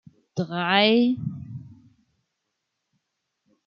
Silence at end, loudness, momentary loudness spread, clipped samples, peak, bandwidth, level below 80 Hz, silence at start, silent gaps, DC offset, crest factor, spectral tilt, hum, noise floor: 1.95 s; -22 LUFS; 21 LU; under 0.1%; -6 dBFS; 6.8 kHz; -68 dBFS; 0.35 s; none; under 0.1%; 20 dB; -6.5 dB/octave; none; -80 dBFS